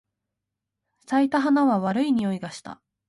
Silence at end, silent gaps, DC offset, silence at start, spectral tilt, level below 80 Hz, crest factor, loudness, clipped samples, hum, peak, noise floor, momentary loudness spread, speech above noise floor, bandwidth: 0.35 s; none; under 0.1%; 1.1 s; -6.5 dB/octave; -68 dBFS; 16 dB; -23 LUFS; under 0.1%; none; -10 dBFS; -84 dBFS; 17 LU; 62 dB; 11.5 kHz